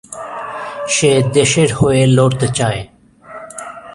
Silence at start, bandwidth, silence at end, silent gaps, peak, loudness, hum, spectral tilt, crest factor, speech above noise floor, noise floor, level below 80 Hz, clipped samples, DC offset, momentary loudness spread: 0.1 s; 11.5 kHz; 0 s; none; 0 dBFS; -13 LUFS; none; -5 dB/octave; 14 dB; 24 dB; -36 dBFS; -42 dBFS; under 0.1%; under 0.1%; 18 LU